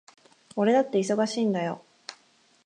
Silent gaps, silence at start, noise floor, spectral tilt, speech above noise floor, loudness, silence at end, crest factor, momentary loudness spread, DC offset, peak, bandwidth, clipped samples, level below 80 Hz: none; 0.55 s; -62 dBFS; -5.5 dB/octave; 38 dB; -25 LUFS; 0.5 s; 18 dB; 21 LU; under 0.1%; -10 dBFS; 10.5 kHz; under 0.1%; -80 dBFS